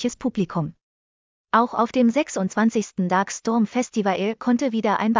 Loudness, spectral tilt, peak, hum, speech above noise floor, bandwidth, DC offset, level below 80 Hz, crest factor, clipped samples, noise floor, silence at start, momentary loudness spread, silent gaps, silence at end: -22 LUFS; -5.5 dB/octave; -6 dBFS; none; over 69 dB; 7.6 kHz; under 0.1%; -62 dBFS; 16 dB; under 0.1%; under -90 dBFS; 0 s; 6 LU; 0.83-1.44 s; 0 s